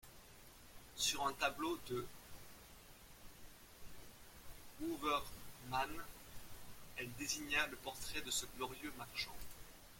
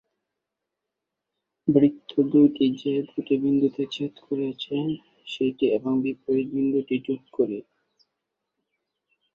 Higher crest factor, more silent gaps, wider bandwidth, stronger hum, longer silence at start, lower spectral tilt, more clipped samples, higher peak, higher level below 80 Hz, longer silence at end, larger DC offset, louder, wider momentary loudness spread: about the same, 24 dB vs 20 dB; neither; first, 16.5 kHz vs 6.8 kHz; neither; second, 0.05 s vs 1.65 s; second, -2 dB/octave vs -8 dB/octave; neither; second, -20 dBFS vs -4 dBFS; first, -62 dBFS vs -68 dBFS; second, 0 s vs 1.75 s; neither; second, -42 LUFS vs -24 LUFS; first, 21 LU vs 10 LU